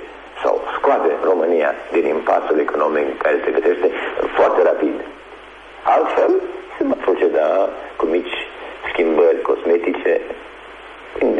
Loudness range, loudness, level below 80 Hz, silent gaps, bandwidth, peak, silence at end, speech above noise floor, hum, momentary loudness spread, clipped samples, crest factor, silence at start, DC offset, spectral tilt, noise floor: 2 LU; -18 LUFS; -52 dBFS; none; 8 kHz; -4 dBFS; 0 s; 22 dB; none; 17 LU; under 0.1%; 14 dB; 0 s; under 0.1%; -5.5 dB/octave; -39 dBFS